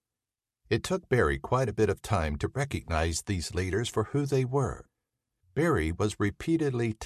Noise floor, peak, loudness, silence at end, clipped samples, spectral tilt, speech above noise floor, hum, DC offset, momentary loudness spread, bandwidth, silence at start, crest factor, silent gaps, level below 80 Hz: under -90 dBFS; -12 dBFS; -29 LUFS; 0 s; under 0.1%; -6 dB/octave; over 62 dB; none; under 0.1%; 5 LU; 14 kHz; 0.7 s; 18 dB; none; -42 dBFS